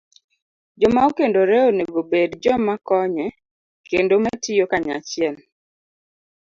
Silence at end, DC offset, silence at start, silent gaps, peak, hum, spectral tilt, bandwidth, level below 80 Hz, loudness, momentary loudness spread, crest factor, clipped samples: 1.2 s; under 0.1%; 0.8 s; 3.51-3.84 s; -4 dBFS; none; -5 dB/octave; 7.6 kHz; -54 dBFS; -19 LUFS; 8 LU; 18 dB; under 0.1%